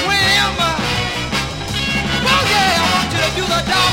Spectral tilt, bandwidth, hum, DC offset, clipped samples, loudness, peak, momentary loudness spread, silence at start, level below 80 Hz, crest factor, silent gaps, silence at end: -3 dB/octave; 16.5 kHz; none; under 0.1%; under 0.1%; -15 LUFS; -2 dBFS; 7 LU; 0 s; -32 dBFS; 14 dB; none; 0 s